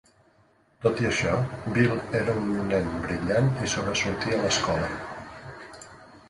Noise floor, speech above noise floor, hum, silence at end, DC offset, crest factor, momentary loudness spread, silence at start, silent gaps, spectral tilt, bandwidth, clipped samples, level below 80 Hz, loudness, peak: -62 dBFS; 37 dB; none; 0.1 s; under 0.1%; 20 dB; 18 LU; 0.8 s; none; -5 dB/octave; 11.5 kHz; under 0.1%; -48 dBFS; -26 LUFS; -8 dBFS